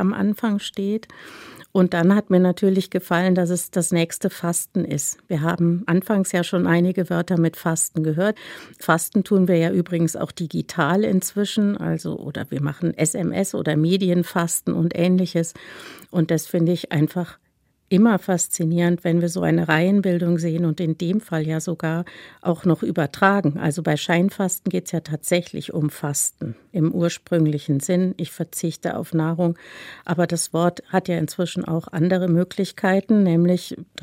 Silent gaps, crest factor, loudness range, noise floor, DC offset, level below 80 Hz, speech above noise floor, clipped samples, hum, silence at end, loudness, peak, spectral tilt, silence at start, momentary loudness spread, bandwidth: none; 20 dB; 3 LU; -66 dBFS; under 0.1%; -62 dBFS; 45 dB; under 0.1%; none; 0.2 s; -21 LUFS; -2 dBFS; -5.5 dB/octave; 0 s; 9 LU; 16 kHz